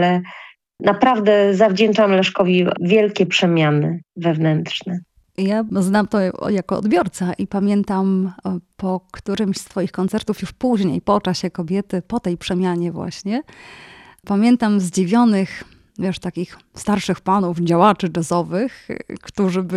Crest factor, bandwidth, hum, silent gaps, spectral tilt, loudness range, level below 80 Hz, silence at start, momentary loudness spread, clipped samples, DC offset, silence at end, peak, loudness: 16 dB; 12.5 kHz; none; none; -6 dB/octave; 6 LU; -52 dBFS; 0 s; 12 LU; under 0.1%; under 0.1%; 0 s; -2 dBFS; -19 LUFS